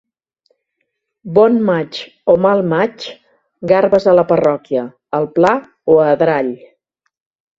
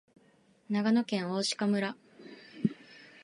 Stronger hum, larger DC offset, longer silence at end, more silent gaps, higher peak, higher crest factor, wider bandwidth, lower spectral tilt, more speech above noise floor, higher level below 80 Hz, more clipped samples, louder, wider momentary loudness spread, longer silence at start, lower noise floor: neither; neither; first, 1.05 s vs 0.2 s; neither; first, 0 dBFS vs -14 dBFS; about the same, 16 dB vs 18 dB; second, 7.6 kHz vs 11.5 kHz; first, -7.5 dB/octave vs -5 dB/octave; first, 59 dB vs 35 dB; first, -56 dBFS vs -76 dBFS; neither; first, -14 LUFS vs -31 LUFS; second, 12 LU vs 22 LU; first, 1.25 s vs 0.7 s; first, -72 dBFS vs -65 dBFS